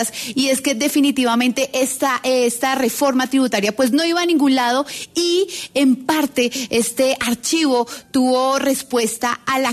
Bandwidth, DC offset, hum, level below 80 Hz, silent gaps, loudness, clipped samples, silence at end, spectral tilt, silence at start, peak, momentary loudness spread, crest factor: 14 kHz; under 0.1%; none; -58 dBFS; none; -18 LUFS; under 0.1%; 0 s; -2.5 dB/octave; 0 s; -6 dBFS; 4 LU; 12 dB